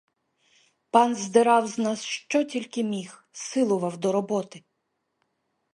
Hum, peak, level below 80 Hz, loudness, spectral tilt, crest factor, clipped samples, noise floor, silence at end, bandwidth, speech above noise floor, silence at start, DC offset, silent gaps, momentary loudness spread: none; -4 dBFS; -78 dBFS; -25 LUFS; -4.5 dB/octave; 22 dB; under 0.1%; -78 dBFS; 1.15 s; 11.5 kHz; 53 dB; 0.95 s; under 0.1%; none; 10 LU